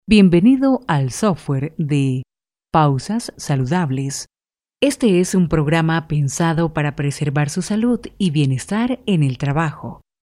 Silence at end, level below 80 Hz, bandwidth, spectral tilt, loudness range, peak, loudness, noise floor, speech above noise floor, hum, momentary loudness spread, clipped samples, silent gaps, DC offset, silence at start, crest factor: 0.3 s; -42 dBFS; 14 kHz; -6 dB/octave; 2 LU; 0 dBFS; -18 LUFS; -79 dBFS; 62 dB; none; 8 LU; under 0.1%; none; under 0.1%; 0.1 s; 16 dB